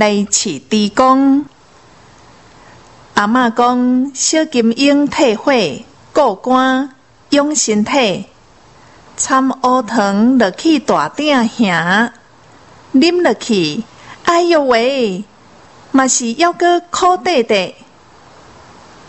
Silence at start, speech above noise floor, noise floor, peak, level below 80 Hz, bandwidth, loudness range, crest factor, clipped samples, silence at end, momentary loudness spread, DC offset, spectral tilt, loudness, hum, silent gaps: 0 s; 32 dB; -45 dBFS; 0 dBFS; -54 dBFS; 8.4 kHz; 2 LU; 14 dB; under 0.1%; 1.35 s; 8 LU; 0.2%; -3.5 dB/octave; -13 LUFS; none; none